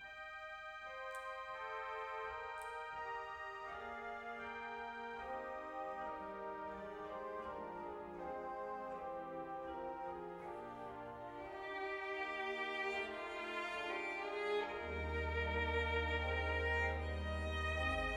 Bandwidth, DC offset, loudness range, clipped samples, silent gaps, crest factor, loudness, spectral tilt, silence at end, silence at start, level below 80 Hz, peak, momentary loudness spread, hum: 11.5 kHz; under 0.1%; 8 LU; under 0.1%; none; 16 dB; -43 LUFS; -5.5 dB/octave; 0 s; 0 s; -52 dBFS; -28 dBFS; 11 LU; none